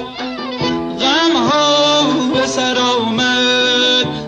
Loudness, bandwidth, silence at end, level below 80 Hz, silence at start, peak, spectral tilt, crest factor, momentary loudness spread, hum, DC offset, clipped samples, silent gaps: -13 LUFS; 9.4 kHz; 0 s; -48 dBFS; 0 s; -4 dBFS; -3 dB/octave; 10 dB; 8 LU; none; under 0.1%; under 0.1%; none